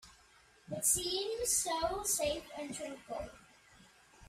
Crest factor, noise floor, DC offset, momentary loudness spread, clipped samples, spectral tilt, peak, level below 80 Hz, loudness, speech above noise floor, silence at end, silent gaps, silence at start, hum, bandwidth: 20 dB; -64 dBFS; under 0.1%; 14 LU; under 0.1%; -1.5 dB/octave; -18 dBFS; -60 dBFS; -34 LUFS; 28 dB; 0 s; none; 0.05 s; none; 15.5 kHz